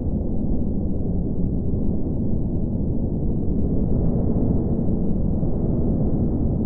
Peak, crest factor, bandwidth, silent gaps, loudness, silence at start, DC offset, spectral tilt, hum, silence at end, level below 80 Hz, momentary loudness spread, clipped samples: -8 dBFS; 12 dB; 1.5 kHz; none; -24 LUFS; 0 s; under 0.1%; -16 dB/octave; none; 0 s; -26 dBFS; 3 LU; under 0.1%